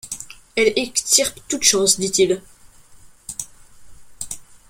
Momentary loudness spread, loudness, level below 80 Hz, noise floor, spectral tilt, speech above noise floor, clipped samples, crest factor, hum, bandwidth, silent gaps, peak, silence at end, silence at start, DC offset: 17 LU; -17 LUFS; -52 dBFS; -46 dBFS; -1.5 dB/octave; 28 dB; under 0.1%; 22 dB; none; 16.5 kHz; none; 0 dBFS; 0.25 s; 0.05 s; under 0.1%